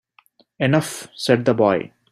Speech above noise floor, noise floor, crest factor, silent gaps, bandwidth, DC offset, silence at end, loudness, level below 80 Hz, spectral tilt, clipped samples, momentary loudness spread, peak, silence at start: 39 dB; -57 dBFS; 18 dB; none; 15.5 kHz; under 0.1%; 0.25 s; -20 LUFS; -60 dBFS; -5.5 dB/octave; under 0.1%; 9 LU; -2 dBFS; 0.6 s